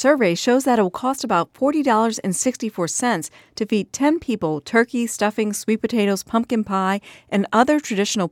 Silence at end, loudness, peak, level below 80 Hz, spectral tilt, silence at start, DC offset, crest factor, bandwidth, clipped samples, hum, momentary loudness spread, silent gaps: 0.05 s; -20 LUFS; -2 dBFS; -60 dBFS; -4.5 dB/octave; 0 s; under 0.1%; 18 dB; 16.5 kHz; under 0.1%; none; 6 LU; none